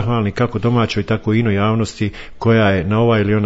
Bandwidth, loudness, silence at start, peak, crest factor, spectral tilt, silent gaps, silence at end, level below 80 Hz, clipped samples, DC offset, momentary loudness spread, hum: 8 kHz; -17 LUFS; 0 s; -2 dBFS; 14 dB; -7.5 dB/octave; none; 0 s; -40 dBFS; under 0.1%; under 0.1%; 7 LU; none